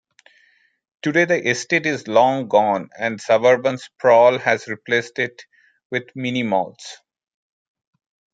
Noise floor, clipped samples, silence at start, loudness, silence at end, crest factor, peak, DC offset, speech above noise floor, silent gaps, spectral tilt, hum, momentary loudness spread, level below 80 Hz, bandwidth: -60 dBFS; under 0.1%; 1.05 s; -19 LUFS; 1.4 s; 18 dB; -2 dBFS; under 0.1%; 41 dB; 5.85-5.90 s; -4.5 dB/octave; none; 12 LU; -70 dBFS; 9.2 kHz